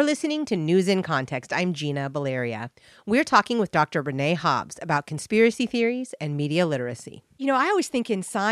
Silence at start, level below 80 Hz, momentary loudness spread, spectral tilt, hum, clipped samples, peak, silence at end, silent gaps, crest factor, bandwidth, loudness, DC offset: 0 s; -66 dBFS; 10 LU; -5.5 dB/octave; none; under 0.1%; -4 dBFS; 0 s; none; 20 dB; 13.5 kHz; -24 LUFS; under 0.1%